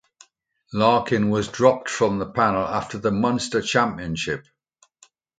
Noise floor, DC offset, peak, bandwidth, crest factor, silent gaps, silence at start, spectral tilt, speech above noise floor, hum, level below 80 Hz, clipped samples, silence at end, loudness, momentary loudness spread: -63 dBFS; under 0.1%; -2 dBFS; 9.4 kHz; 20 dB; none; 0.7 s; -5 dB/octave; 42 dB; none; -52 dBFS; under 0.1%; 1 s; -22 LUFS; 8 LU